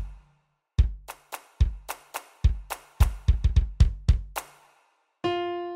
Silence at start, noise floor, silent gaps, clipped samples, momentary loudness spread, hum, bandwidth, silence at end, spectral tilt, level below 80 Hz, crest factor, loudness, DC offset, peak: 0 s; -69 dBFS; none; under 0.1%; 16 LU; none; 16 kHz; 0 s; -6.5 dB/octave; -28 dBFS; 20 dB; -28 LUFS; under 0.1%; -6 dBFS